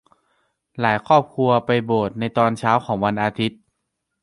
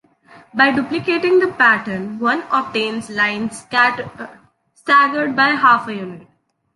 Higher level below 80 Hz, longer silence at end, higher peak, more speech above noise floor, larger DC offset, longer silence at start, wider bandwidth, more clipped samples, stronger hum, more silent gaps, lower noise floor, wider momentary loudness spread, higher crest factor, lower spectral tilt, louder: first, -56 dBFS vs -62 dBFS; first, 0.7 s vs 0.55 s; about the same, -2 dBFS vs -2 dBFS; first, 58 dB vs 30 dB; neither; first, 0.75 s vs 0.35 s; about the same, 11.5 kHz vs 11.5 kHz; neither; neither; neither; first, -77 dBFS vs -47 dBFS; second, 6 LU vs 15 LU; about the same, 18 dB vs 16 dB; first, -7 dB/octave vs -4.5 dB/octave; second, -20 LUFS vs -16 LUFS